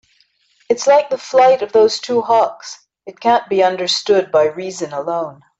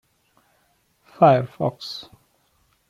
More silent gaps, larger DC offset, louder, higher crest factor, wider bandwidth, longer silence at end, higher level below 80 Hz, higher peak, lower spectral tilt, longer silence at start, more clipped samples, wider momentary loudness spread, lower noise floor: neither; neither; first, -15 LUFS vs -20 LUFS; second, 14 dB vs 22 dB; second, 8.2 kHz vs 13.5 kHz; second, 0.25 s vs 0.85 s; about the same, -64 dBFS vs -64 dBFS; about the same, -2 dBFS vs -2 dBFS; second, -3 dB/octave vs -7.5 dB/octave; second, 0.7 s vs 1.2 s; neither; second, 11 LU vs 17 LU; second, -58 dBFS vs -65 dBFS